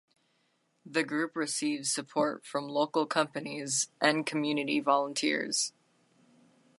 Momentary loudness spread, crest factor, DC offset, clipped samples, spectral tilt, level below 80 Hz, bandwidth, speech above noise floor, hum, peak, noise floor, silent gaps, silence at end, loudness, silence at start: 6 LU; 22 dB; under 0.1%; under 0.1%; -2.5 dB/octave; -84 dBFS; 11.5 kHz; 43 dB; none; -10 dBFS; -74 dBFS; none; 1.1 s; -30 LUFS; 0.85 s